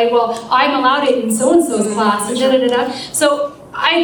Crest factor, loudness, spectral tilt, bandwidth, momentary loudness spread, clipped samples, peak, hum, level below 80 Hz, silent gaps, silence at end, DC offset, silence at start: 14 dB; -15 LUFS; -3 dB/octave; over 20 kHz; 5 LU; under 0.1%; 0 dBFS; none; -56 dBFS; none; 0 s; under 0.1%; 0 s